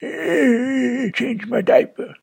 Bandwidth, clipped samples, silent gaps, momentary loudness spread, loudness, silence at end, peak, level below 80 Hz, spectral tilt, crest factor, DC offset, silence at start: 16.5 kHz; under 0.1%; none; 6 LU; -18 LUFS; 0.1 s; -2 dBFS; -68 dBFS; -6 dB/octave; 18 dB; under 0.1%; 0 s